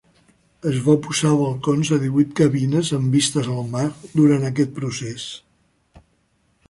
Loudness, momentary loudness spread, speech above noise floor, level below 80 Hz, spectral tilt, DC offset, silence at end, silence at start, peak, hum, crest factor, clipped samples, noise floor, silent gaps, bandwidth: -20 LUFS; 11 LU; 45 dB; -56 dBFS; -6 dB/octave; under 0.1%; 1.3 s; 0.65 s; -4 dBFS; none; 18 dB; under 0.1%; -64 dBFS; none; 11.5 kHz